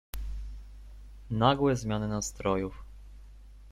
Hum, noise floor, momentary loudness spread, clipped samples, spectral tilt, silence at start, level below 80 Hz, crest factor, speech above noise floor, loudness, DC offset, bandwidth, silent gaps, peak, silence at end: 50 Hz at -45 dBFS; -50 dBFS; 26 LU; under 0.1%; -5.5 dB/octave; 0.15 s; -44 dBFS; 22 dB; 21 dB; -30 LUFS; under 0.1%; 16 kHz; none; -10 dBFS; 0 s